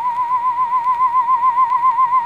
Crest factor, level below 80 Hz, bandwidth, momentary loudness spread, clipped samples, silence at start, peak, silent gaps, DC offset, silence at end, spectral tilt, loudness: 8 dB; -66 dBFS; 5 kHz; 3 LU; under 0.1%; 0 s; -6 dBFS; none; 0.2%; 0 s; -3.5 dB/octave; -16 LUFS